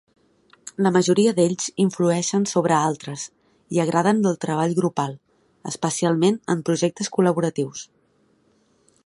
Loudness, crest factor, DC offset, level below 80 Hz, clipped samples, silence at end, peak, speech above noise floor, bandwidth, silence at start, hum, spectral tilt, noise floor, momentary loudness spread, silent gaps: -21 LUFS; 18 dB; under 0.1%; -66 dBFS; under 0.1%; 1.2 s; -4 dBFS; 42 dB; 11.5 kHz; 0.65 s; none; -5.5 dB/octave; -62 dBFS; 14 LU; none